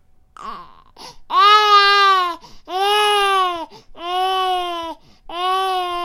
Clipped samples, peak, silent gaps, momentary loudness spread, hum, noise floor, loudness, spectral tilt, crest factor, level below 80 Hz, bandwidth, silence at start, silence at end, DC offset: under 0.1%; 0 dBFS; none; 23 LU; none; -41 dBFS; -15 LUFS; -0.5 dB/octave; 18 dB; -50 dBFS; 16.5 kHz; 0.4 s; 0 s; under 0.1%